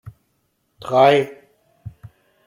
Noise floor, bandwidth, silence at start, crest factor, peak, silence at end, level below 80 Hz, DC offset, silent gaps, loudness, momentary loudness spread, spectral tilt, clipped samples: -68 dBFS; 15 kHz; 0.85 s; 18 dB; -2 dBFS; 0.6 s; -58 dBFS; under 0.1%; none; -16 LUFS; 26 LU; -6 dB/octave; under 0.1%